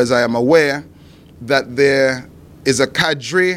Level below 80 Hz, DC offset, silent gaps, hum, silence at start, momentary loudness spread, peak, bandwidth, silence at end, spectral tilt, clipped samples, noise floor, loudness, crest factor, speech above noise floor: -50 dBFS; under 0.1%; none; none; 0 s; 10 LU; 0 dBFS; 15.5 kHz; 0 s; -4 dB/octave; under 0.1%; -42 dBFS; -15 LUFS; 16 dB; 27 dB